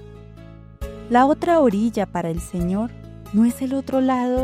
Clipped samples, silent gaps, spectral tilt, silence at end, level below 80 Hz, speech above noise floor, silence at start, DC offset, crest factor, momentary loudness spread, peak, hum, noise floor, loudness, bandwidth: under 0.1%; none; -7 dB/octave; 0 s; -40 dBFS; 22 dB; 0 s; under 0.1%; 16 dB; 16 LU; -6 dBFS; none; -41 dBFS; -20 LUFS; 15.5 kHz